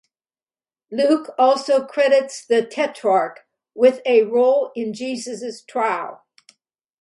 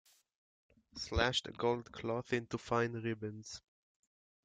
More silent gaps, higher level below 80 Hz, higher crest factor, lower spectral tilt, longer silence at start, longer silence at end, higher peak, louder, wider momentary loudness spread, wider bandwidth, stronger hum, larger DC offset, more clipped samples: neither; second, -74 dBFS vs -56 dBFS; second, 16 dB vs 22 dB; about the same, -4 dB/octave vs -4.5 dB/octave; about the same, 0.9 s vs 0.95 s; about the same, 0.85 s vs 0.85 s; first, -4 dBFS vs -16 dBFS; first, -19 LUFS vs -37 LUFS; second, 11 LU vs 15 LU; first, 11.5 kHz vs 9.6 kHz; neither; neither; neither